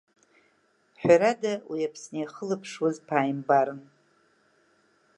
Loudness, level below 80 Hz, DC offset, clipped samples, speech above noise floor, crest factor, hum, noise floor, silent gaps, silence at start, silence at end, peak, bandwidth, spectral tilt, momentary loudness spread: -26 LUFS; -70 dBFS; under 0.1%; under 0.1%; 41 dB; 22 dB; none; -67 dBFS; none; 1 s; 1.35 s; -6 dBFS; 10.5 kHz; -5.5 dB/octave; 13 LU